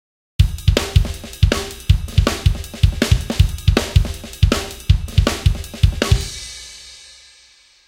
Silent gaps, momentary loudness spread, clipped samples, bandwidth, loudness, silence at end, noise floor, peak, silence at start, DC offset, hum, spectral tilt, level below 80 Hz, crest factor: none; 13 LU; under 0.1%; 16.5 kHz; -18 LUFS; 0.9 s; -50 dBFS; 0 dBFS; 0.4 s; under 0.1%; none; -5 dB/octave; -22 dBFS; 18 dB